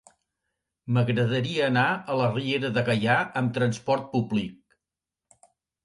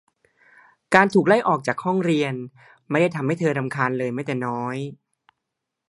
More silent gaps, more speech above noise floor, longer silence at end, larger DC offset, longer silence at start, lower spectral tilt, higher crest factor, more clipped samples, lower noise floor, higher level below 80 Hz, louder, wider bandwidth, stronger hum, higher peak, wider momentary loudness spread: neither; first, 64 dB vs 60 dB; first, 1.3 s vs 0.95 s; neither; about the same, 0.85 s vs 0.9 s; about the same, -6.5 dB/octave vs -6.5 dB/octave; about the same, 18 dB vs 22 dB; neither; first, -89 dBFS vs -82 dBFS; first, -62 dBFS vs -68 dBFS; second, -25 LUFS vs -22 LUFS; about the same, 11.5 kHz vs 11.5 kHz; neither; second, -10 dBFS vs 0 dBFS; second, 5 LU vs 12 LU